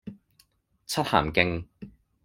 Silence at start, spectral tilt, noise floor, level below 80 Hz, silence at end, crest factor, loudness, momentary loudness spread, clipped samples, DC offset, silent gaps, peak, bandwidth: 0.05 s; -4.5 dB/octave; -65 dBFS; -50 dBFS; 0.35 s; 28 dB; -26 LUFS; 24 LU; under 0.1%; under 0.1%; none; -2 dBFS; 16 kHz